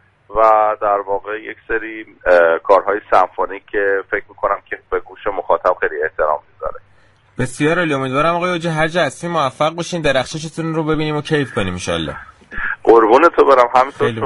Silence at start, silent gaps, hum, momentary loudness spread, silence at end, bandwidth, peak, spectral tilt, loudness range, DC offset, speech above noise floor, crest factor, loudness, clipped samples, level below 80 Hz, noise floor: 0.3 s; none; none; 13 LU; 0 s; 11.5 kHz; 0 dBFS; -5.5 dB/octave; 5 LU; under 0.1%; 35 dB; 16 dB; -16 LUFS; under 0.1%; -42 dBFS; -51 dBFS